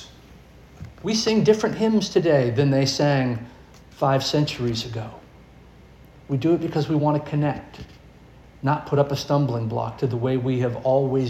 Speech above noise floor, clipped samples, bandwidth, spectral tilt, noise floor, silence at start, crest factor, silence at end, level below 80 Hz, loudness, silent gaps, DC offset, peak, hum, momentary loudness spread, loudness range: 26 dB; under 0.1%; 13.5 kHz; -6 dB/octave; -48 dBFS; 0 s; 18 dB; 0 s; -52 dBFS; -22 LUFS; none; under 0.1%; -4 dBFS; none; 13 LU; 5 LU